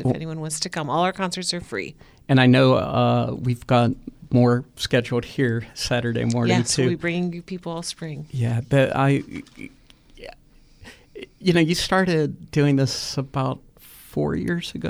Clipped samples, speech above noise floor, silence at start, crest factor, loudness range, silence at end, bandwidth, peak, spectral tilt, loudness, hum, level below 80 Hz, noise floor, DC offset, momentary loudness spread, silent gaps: under 0.1%; 30 dB; 0 s; 20 dB; 5 LU; 0 s; 15 kHz; -4 dBFS; -5.5 dB/octave; -22 LUFS; none; -48 dBFS; -52 dBFS; under 0.1%; 17 LU; none